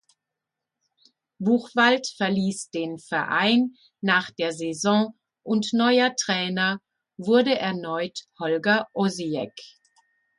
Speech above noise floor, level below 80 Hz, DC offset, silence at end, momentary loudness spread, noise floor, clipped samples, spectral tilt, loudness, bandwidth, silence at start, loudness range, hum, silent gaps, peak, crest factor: 62 dB; -72 dBFS; under 0.1%; 0.7 s; 11 LU; -85 dBFS; under 0.1%; -4 dB/octave; -24 LUFS; 11.5 kHz; 1.4 s; 2 LU; none; none; -6 dBFS; 18 dB